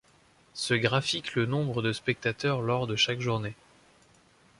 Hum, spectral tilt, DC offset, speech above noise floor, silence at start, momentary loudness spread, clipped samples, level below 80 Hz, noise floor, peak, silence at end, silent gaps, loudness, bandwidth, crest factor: none; -4.5 dB/octave; under 0.1%; 33 dB; 0.55 s; 7 LU; under 0.1%; -62 dBFS; -62 dBFS; -10 dBFS; 1.05 s; none; -28 LUFS; 11.5 kHz; 20 dB